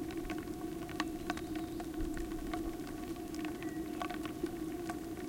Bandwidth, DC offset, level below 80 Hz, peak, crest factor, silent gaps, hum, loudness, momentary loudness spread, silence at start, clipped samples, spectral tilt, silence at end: 17 kHz; under 0.1%; -50 dBFS; -18 dBFS; 22 dB; none; none; -41 LUFS; 3 LU; 0 s; under 0.1%; -5 dB/octave; 0 s